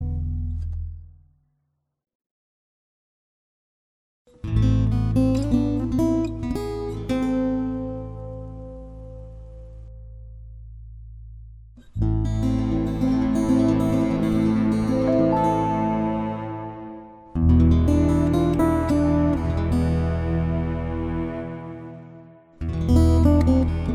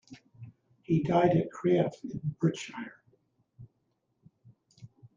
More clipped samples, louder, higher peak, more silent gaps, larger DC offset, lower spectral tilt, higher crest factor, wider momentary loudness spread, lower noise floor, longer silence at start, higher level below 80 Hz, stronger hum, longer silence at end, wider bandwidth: neither; first, -22 LUFS vs -29 LUFS; first, -6 dBFS vs -10 dBFS; first, 2.15-2.20 s, 2.26-4.25 s vs none; neither; about the same, -8.5 dB/octave vs -7.5 dB/octave; about the same, 18 dB vs 22 dB; about the same, 23 LU vs 23 LU; about the same, -74 dBFS vs -77 dBFS; about the same, 0 s vs 0.1 s; first, -30 dBFS vs -66 dBFS; neither; second, 0 s vs 0.3 s; first, 12 kHz vs 7.6 kHz